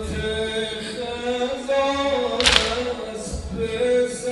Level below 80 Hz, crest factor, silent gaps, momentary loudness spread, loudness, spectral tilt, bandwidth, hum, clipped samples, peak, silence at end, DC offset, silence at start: -38 dBFS; 22 dB; none; 13 LU; -22 LUFS; -3 dB/octave; 11.5 kHz; none; under 0.1%; 0 dBFS; 0 s; under 0.1%; 0 s